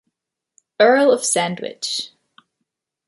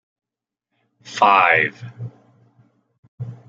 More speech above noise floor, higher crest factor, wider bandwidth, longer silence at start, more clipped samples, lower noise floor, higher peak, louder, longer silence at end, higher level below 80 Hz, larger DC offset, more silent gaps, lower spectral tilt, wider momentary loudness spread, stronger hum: about the same, 63 dB vs 66 dB; about the same, 18 dB vs 20 dB; first, 11.5 kHz vs 8 kHz; second, 0.8 s vs 1.05 s; neither; second, -80 dBFS vs -84 dBFS; about the same, -2 dBFS vs -2 dBFS; about the same, -17 LUFS vs -15 LUFS; first, 1 s vs 0.15 s; second, -74 dBFS vs -68 dBFS; neither; second, none vs 2.99-3.18 s; second, -2.5 dB/octave vs -4.5 dB/octave; second, 13 LU vs 23 LU; neither